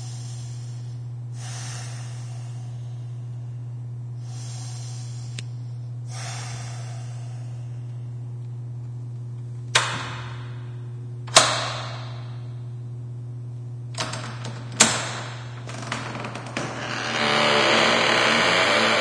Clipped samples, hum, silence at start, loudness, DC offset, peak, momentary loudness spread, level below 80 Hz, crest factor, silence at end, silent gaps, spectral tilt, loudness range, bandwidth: under 0.1%; none; 0 s; -25 LUFS; under 0.1%; 0 dBFS; 17 LU; -58 dBFS; 26 dB; 0 s; none; -3 dB/octave; 12 LU; 11 kHz